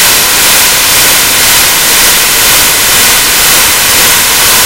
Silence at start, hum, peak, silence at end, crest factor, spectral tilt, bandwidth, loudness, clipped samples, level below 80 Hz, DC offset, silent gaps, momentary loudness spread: 0 s; none; 0 dBFS; 0 s; 6 dB; 0.5 dB/octave; over 20 kHz; -3 LUFS; 6%; -30 dBFS; 2%; none; 1 LU